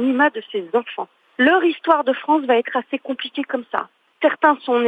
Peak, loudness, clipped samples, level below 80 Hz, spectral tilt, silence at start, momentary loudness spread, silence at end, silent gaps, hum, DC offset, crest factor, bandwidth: -2 dBFS; -19 LUFS; under 0.1%; -72 dBFS; -6 dB/octave; 0 s; 11 LU; 0 s; none; none; under 0.1%; 16 dB; 4.9 kHz